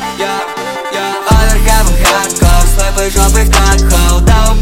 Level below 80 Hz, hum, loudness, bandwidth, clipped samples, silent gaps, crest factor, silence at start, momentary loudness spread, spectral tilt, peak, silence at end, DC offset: -10 dBFS; none; -10 LUFS; 16.5 kHz; 0.1%; none; 8 dB; 0 s; 8 LU; -4 dB/octave; 0 dBFS; 0 s; under 0.1%